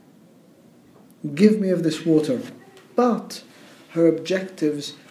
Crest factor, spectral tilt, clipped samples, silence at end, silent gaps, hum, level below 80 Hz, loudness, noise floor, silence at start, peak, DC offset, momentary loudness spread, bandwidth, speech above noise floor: 20 dB; -6.5 dB/octave; under 0.1%; 0.15 s; none; none; -74 dBFS; -22 LUFS; -52 dBFS; 1.25 s; -2 dBFS; under 0.1%; 16 LU; 14 kHz; 31 dB